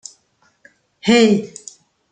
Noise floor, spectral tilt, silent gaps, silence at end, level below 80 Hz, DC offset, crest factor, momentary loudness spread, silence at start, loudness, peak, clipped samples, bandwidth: -60 dBFS; -4.5 dB/octave; none; 0.65 s; -60 dBFS; under 0.1%; 18 dB; 26 LU; 1.05 s; -15 LUFS; -2 dBFS; under 0.1%; 9.4 kHz